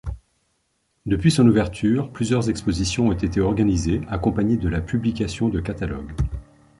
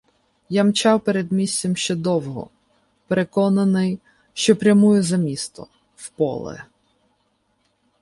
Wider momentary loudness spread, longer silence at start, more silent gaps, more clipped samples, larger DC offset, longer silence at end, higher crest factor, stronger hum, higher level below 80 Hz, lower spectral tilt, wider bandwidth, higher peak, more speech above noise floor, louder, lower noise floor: second, 11 LU vs 19 LU; second, 0.05 s vs 0.5 s; neither; neither; neither; second, 0.35 s vs 1.4 s; about the same, 18 dB vs 18 dB; neither; first, -34 dBFS vs -60 dBFS; about the same, -6.5 dB/octave vs -5.5 dB/octave; about the same, 11.5 kHz vs 11.5 kHz; about the same, -4 dBFS vs -2 dBFS; about the same, 49 dB vs 48 dB; second, -22 LUFS vs -19 LUFS; about the same, -70 dBFS vs -67 dBFS